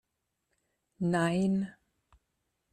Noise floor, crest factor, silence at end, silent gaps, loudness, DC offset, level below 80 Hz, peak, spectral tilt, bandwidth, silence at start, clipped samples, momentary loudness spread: -83 dBFS; 16 dB; 1 s; none; -31 LUFS; under 0.1%; -68 dBFS; -18 dBFS; -7 dB/octave; 10 kHz; 1 s; under 0.1%; 8 LU